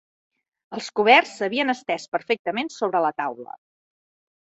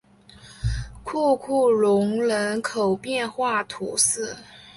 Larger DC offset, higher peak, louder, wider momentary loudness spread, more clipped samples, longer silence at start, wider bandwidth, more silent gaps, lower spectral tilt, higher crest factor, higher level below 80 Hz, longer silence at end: neither; about the same, -2 dBFS vs -4 dBFS; about the same, -22 LUFS vs -23 LUFS; first, 18 LU vs 12 LU; neither; first, 0.7 s vs 0.45 s; second, 8.2 kHz vs 11.5 kHz; first, 2.08-2.12 s, 2.39-2.45 s vs none; about the same, -3.5 dB/octave vs -4 dB/octave; about the same, 22 dB vs 20 dB; second, -74 dBFS vs -42 dBFS; first, 1.15 s vs 0.05 s